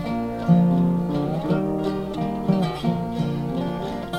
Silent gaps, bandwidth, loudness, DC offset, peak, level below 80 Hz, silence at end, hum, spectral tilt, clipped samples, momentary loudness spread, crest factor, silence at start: none; 9.4 kHz; -23 LUFS; under 0.1%; -6 dBFS; -44 dBFS; 0 s; none; -8.5 dB/octave; under 0.1%; 8 LU; 16 dB; 0 s